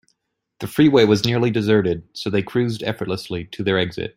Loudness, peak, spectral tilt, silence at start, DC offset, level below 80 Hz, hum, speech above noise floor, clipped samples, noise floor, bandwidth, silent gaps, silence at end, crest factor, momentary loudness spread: -20 LUFS; -2 dBFS; -6.5 dB/octave; 0.6 s; under 0.1%; -52 dBFS; none; 53 dB; under 0.1%; -72 dBFS; 16 kHz; none; 0.1 s; 18 dB; 12 LU